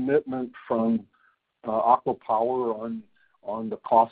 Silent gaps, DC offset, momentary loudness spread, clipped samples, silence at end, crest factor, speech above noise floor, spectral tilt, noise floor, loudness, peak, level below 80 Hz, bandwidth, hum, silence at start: none; under 0.1%; 14 LU; under 0.1%; 0.05 s; 20 dB; 30 dB; -6.5 dB/octave; -54 dBFS; -26 LUFS; -6 dBFS; -68 dBFS; 4.6 kHz; none; 0 s